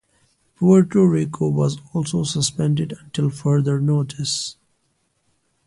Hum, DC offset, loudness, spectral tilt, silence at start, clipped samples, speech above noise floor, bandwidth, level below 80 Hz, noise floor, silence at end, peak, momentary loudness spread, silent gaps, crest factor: none; under 0.1%; -20 LUFS; -6 dB/octave; 0.6 s; under 0.1%; 49 dB; 11.5 kHz; -56 dBFS; -68 dBFS; 1.15 s; -4 dBFS; 9 LU; none; 16 dB